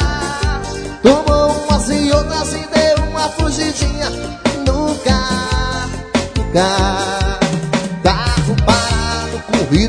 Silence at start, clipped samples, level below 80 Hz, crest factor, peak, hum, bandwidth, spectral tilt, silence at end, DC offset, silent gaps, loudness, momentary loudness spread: 0 s; under 0.1%; -22 dBFS; 16 dB; 0 dBFS; none; 10 kHz; -5 dB/octave; 0 s; under 0.1%; none; -16 LUFS; 6 LU